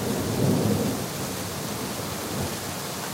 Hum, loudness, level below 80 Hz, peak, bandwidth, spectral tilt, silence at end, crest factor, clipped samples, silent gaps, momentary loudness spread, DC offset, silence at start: none; -27 LUFS; -50 dBFS; -10 dBFS; 16 kHz; -4.5 dB/octave; 0 s; 16 dB; under 0.1%; none; 7 LU; under 0.1%; 0 s